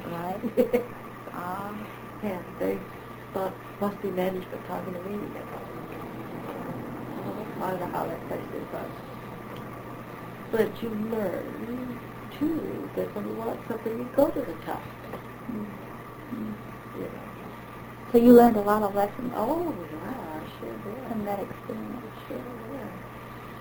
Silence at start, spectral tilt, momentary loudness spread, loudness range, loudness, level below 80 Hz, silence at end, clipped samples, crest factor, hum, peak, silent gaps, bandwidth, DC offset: 0 s; -7.5 dB/octave; 15 LU; 13 LU; -29 LUFS; -56 dBFS; 0 s; under 0.1%; 24 dB; none; -4 dBFS; none; over 20 kHz; under 0.1%